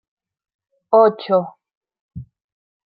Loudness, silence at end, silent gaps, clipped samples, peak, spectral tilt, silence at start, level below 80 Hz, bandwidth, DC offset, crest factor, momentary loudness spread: -16 LUFS; 0.65 s; 1.77-1.81 s, 2.01-2.09 s; under 0.1%; -2 dBFS; -10.5 dB/octave; 0.9 s; -58 dBFS; 5.2 kHz; under 0.1%; 20 dB; 24 LU